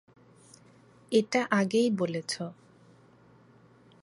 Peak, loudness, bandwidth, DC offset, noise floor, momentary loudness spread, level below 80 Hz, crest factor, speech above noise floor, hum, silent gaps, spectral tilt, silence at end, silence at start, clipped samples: -10 dBFS; -28 LUFS; 11.5 kHz; under 0.1%; -58 dBFS; 10 LU; -78 dBFS; 22 dB; 31 dB; none; none; -5 dB/octave; 1.5 s; 1.1 s; under 0.1%